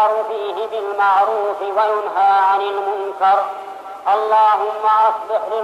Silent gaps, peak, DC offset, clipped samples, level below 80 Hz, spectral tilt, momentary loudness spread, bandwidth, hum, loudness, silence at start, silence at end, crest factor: none; -4 dBFS; under 0.1%; under 0.1%; -70 dBFS; -3 dB/octave; 9 LU; 12.5 kHz; none; -17 LUFS; 0 s; 0 s; 12 dB